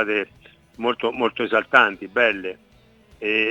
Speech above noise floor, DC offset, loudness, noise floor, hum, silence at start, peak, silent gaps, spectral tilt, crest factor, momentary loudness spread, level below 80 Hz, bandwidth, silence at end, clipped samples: 32 dB; under 0.1%; -21 LUFS; -53 dBFS; none; 0 s; 0 dBFS; none; -5 dB/octave; 22 dB; 13 LU; -62 dBFS; 9.2 kHz; 0 s; under 0.1%